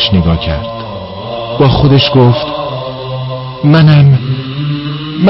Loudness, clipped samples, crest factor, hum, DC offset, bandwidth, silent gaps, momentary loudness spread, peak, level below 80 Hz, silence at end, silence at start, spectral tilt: -11 LUFS; under 0.1%; 10 dB; none; under 0.1%; 5.8 kHz; none; 15 LU; 0 dBFS; -28 dBFS; 0 s; 0 s; -10 dB/octave